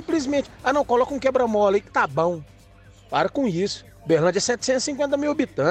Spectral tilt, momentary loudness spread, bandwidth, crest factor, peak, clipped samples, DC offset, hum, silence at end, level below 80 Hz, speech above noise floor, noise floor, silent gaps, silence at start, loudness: -4.5 dB/octave; 6 LU; 10.5 kHz; 16 dB; -6 dBFS; under 0.1%; under 0.1%; none; 0 s; -52 dBFS; 28 dB; -49 dBFS; none; 0 s; -22 LUFS